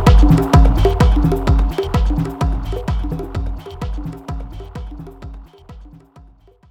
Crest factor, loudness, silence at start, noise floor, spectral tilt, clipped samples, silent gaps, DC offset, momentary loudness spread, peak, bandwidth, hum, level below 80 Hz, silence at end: 16 dB; -17 LUFS; 0 s; -46 dBFS; -7.5 dB/octave; under 0.1%; none; under 0.1%; 20 LU; 0 dBFS; 14 kHz; none; -18 dBFS; 0.85 s